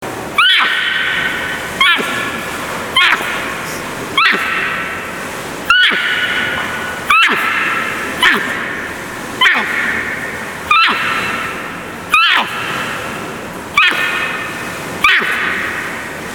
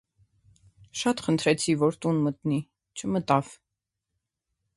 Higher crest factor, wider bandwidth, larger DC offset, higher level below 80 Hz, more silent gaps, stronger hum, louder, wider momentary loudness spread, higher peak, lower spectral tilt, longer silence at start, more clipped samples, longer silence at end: second, 16 dB vs 22 dB; first, over 20 kHz vs 11.5 kHz; neither; first, -46 dBFS vs -64 dBFS; neither; neither; first, -14 LUFS vs -26 LUFS; about the same, 13 LU vs 13 LU; first, 0 dBFS vs -6 dBFS; second, -2 dB/octave vs -5.5 dB/octave; second, 0 s vs 0.95 s; neither; second, 0 s vs 1.2 s